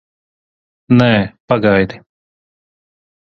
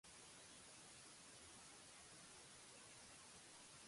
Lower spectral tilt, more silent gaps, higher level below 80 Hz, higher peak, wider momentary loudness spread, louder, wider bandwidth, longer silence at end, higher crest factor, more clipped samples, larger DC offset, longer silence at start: first, -8.5 dB/octave vs -1.5 dB/octave; first, 1.40-1.48 s vs none; first, -46 dBFS vs -84 dBFS; first, 0 dBFS vs -50 dBFS; first, 6 LU vs 0 LU; first, -14 LUFS vs -60 LUFS; second, 6.6 kHz vs 11.5 kHz; first, 1.3 s vs 0 s; about the same, 18 dB vs 14 dB; neither; neither; first, 0.9 s vs 0.05 s